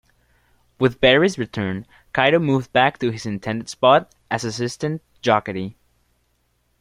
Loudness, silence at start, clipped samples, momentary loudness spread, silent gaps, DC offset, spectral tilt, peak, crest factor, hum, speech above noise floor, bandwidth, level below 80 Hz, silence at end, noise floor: -20 LUFS; 0.8 s; under 0.1%; 12 LU; none; under 0.1%; -5 dB/octave; -2 dBFS; 20 dB; none; 47 dB; 14.5 kHz; -52 dBFS; 1.1 s; -66 dBFS